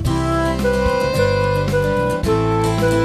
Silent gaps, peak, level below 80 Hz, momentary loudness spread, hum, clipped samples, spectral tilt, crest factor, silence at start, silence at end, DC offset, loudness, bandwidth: none; -4 dBFS; -30 dBFS; 2 LU; none; under 0.1%; -6.5 dB/octave; 12 dB; 0 s; 0 s; under 0.1%; -18 LUFS; 14 kHz